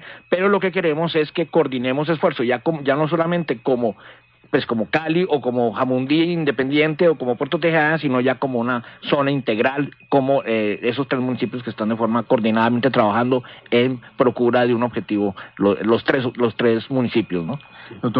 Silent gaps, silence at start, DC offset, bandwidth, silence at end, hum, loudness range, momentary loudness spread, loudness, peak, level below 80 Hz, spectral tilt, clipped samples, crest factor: none; 0 s; under 0.1%; 5.4 kHz; 0 s; none; 2 LU; 6 LU; -20 LUFS; -4 dBFS; -58 dBFS; -9.5 dB/octave; under 0.1%; 16 dB